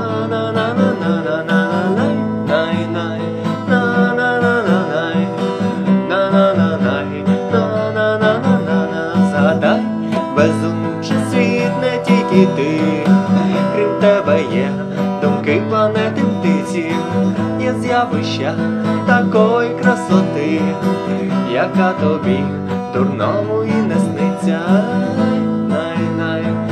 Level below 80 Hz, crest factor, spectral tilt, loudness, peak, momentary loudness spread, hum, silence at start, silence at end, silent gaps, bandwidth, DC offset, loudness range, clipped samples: -58 dBFS; 16 dB; -7 dB/octave; -16 LUFS; 0 dBFS; 6 LU; none; 0 s; 0 s; none; 9.8 kHz; under 0.1%; 2 LU; under 0.1%